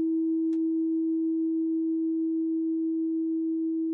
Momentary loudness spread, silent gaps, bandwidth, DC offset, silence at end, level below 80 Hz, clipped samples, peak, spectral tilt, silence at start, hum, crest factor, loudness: 2 LU; none; 1 kHz; under 0.1%; 0 s; under -90 dBFS; under 0.1%; -22 dBFS; -3 dB/octave; 0 s; none; 4 dB; -28 LUFS